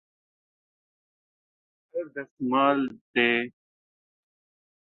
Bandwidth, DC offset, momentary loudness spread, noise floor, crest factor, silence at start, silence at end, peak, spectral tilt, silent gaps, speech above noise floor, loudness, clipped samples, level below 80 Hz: 4.3 kHz; under 0.1%; 15 LU; under -90 dBFS; 24 dB; 1.95 s; 1.4 s; -6 dBFS; -7.5 dB/octave; 2.31-2.37 s, 3.01-3.14 s; over 64 dB; -26 LUFS; under 0.1%; -76 dBFS